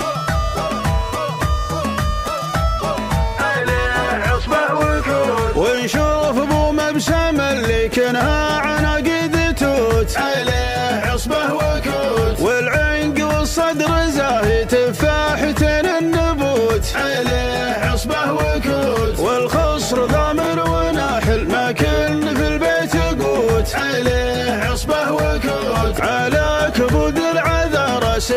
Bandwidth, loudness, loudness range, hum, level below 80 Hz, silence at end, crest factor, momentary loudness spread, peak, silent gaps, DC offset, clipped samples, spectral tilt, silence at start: 16 kHz; -17 LUFS; 1 LU; none; -26 dBFS; 0 s; 14 dB; 4 LU; -2 dBFS; none; under 0.1%; under 0.1%; -5 dB/octave; 0 s